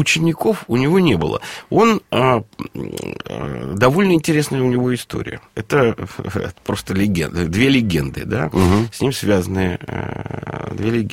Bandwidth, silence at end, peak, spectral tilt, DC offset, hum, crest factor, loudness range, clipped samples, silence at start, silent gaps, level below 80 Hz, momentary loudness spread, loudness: 16.5 kHz; 0 s; 0 dBFS; -6 dB/octave; under 0.1%; none; 18 dB; 2 LU; under 0.1%; 0 s; none; -42 dBFS; 13 LU; -18 LUFS